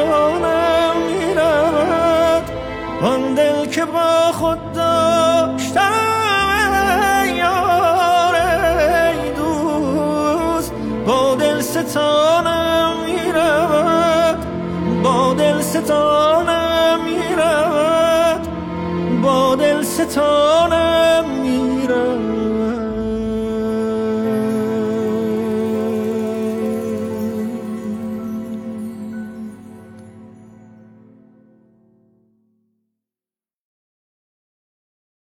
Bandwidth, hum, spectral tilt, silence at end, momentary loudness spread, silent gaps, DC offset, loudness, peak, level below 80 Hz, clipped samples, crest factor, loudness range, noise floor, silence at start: 17.5 kHz; none; -4.5 dB/octave; 4.95 s; 9 LU; none; under 0.1%; -16 LUFS; -4 dBFS; -40 dBFS; under 0.1%; 12 dB; 9 LU; under -90 dBFS; 0 s